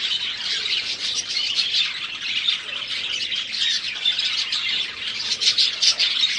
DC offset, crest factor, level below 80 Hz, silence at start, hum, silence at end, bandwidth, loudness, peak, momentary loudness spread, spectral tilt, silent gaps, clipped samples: under 0.1%; 20 dB; -64 dBFS; 0 s; none; 0 s; 11.5 kHz; -20 LUFS; -2 dBFS; 8 LU; 2 dB/octave; none; under 0.1%